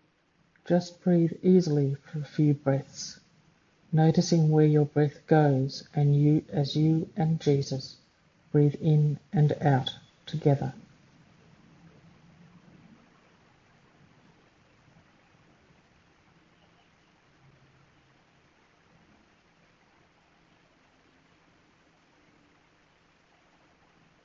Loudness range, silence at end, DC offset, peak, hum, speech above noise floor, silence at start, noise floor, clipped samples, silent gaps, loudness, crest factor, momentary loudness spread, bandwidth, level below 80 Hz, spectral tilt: 7 LU; 13.45 s; under 0.1%; -8 dBFS; none; 43 dB; 0.65 s; -67 dBFS; under 0.1%; none; -26 LUFS; 20 dB; 13 LU; 7.4 kHz; -68 dBFS; -7.5 dB/octave